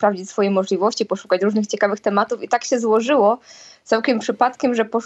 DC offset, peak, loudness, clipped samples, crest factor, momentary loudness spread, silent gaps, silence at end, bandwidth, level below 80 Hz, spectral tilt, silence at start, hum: under 0.1%; -2 dBFS; -19 LUFS; under 0.1%; 16 dB; 5 LU; none; 0 s; 8.2 kHz; -70 dBFS; -4.5 dB/octave; 0 s; none